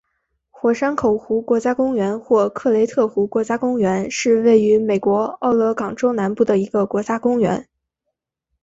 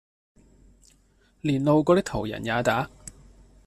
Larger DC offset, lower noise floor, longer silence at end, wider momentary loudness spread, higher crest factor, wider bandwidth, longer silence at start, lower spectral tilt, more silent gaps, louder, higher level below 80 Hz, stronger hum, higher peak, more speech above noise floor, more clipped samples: neither; first, -78 dBFS vs -62 dBFS; first, 1 s vs 0.55 s; second, 5 LU vs 16 LU; second, 14 dB vs 20 dB; second, 8 kHz vs 14 kHz; second, 0.65 s vs 1.45 s; about the same, -6 dB/octave vs -6 dB/octave; neither; first, -18 LUFS vs -24 LUFS; about the same, -56 dBFS vs -52 dBFS; neither; first, -4 dBFS vs -8 dBFS; first, 61 dB vs 39 dB; neither